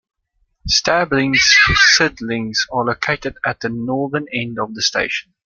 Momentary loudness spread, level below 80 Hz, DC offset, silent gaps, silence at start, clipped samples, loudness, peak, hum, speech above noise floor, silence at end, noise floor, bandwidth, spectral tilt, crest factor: 14 LU; -40 dBFS; under 0.1%; none; 0.65 s; under 0.1%; -15 LUFS; 0 dBFS; none; 48 dB; 0.35 s; -65 dBFS; 12 kHz; -2.5 dB/octave; 18 dB